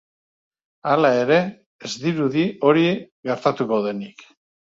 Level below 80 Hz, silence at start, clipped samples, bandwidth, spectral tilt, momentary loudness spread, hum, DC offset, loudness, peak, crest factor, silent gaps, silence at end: -64 dBFS; 0.85 s; under 0.1%; 7.8 kHz; -6 dB/octave; 14 LU; none; under 0.1%; -20 LUFS; -2 dBFS; 20 dB; 1.66-1.79 s, 3.12-3.23 s; 0.7 s